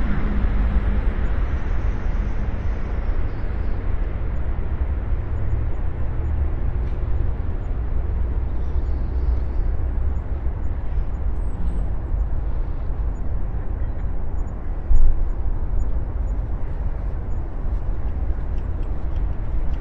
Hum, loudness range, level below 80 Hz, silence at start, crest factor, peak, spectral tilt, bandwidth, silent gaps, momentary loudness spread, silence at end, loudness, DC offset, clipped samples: none; 2 LU; -22 dBFS; 0 s; 18 dB; -2 dBFS; -9.5 dB/octave; 3.7 kHz; none; 5 LU; 0 s; -27 LUFS; under 0.1%; under 0.1%